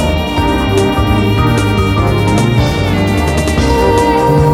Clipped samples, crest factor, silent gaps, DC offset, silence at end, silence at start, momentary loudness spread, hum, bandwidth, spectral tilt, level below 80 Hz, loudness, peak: under 0.1%; 10 dB; none; 0.1%; 0 s; 0 s; 3 LU; none; 16 kHz; -6 dB/octave; -20 dBFS; -12 LUFS; 0 dBFS